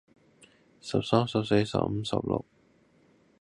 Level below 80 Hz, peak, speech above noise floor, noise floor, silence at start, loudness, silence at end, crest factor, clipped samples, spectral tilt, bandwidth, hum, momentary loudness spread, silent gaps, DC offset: -56 dBFS; -6 dBFS; 36 dB; -64 dBFS; 0.85 s; -28 LUFS; 1 s; 24 dB; under 0.1%; -6.5 dB/octave; 11.5 kHz; none; 7 LU; none; under 0.1%